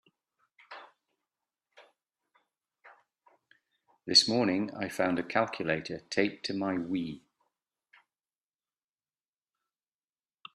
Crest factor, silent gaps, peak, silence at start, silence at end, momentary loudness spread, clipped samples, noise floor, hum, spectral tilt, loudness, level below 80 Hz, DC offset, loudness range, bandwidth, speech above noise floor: 28 dB; none; -8 dBFS; 0.7 s; 3.35 s; 26 LU; under 0.1%; under -90 dBFS; none; -3.5 dB/octave; -29 LUFS; -74 dBFS; under 0.1%; 11 LU; 13 kHz; over 60 dB